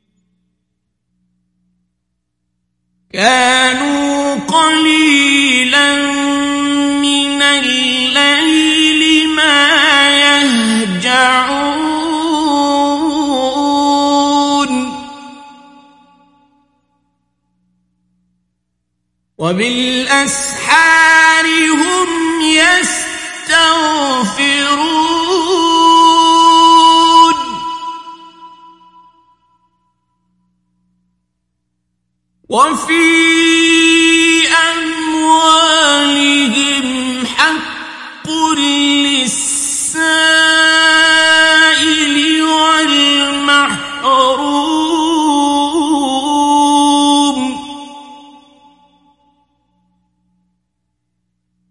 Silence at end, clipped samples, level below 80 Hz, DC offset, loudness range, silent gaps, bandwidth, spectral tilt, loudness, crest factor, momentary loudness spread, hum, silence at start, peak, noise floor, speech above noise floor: 3.5 s; under 0.1%; -52 dBFS; under 0.1%; 8 LU; none; 11.5 kHz; -1.5 dB/octave; -10 LUFS; 12 dB; 9 LU; 60 Hz at -55 dBFS; 3.15 s; 0 dBFS; -70 dBFS; 60 dB